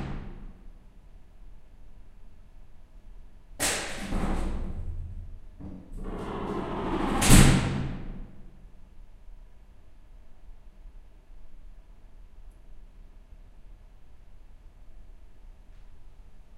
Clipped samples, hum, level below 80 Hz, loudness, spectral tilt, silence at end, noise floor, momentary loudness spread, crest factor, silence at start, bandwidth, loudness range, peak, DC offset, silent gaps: under 0.1%; none; -34 dBFS; -27 LUFS; -4.5 dB/octave; 0 s; -49 dBFS; 27 LU; 28 dB; 0 s; 16 kHz; 12 LU; -2 dBFS; under 0.1%; none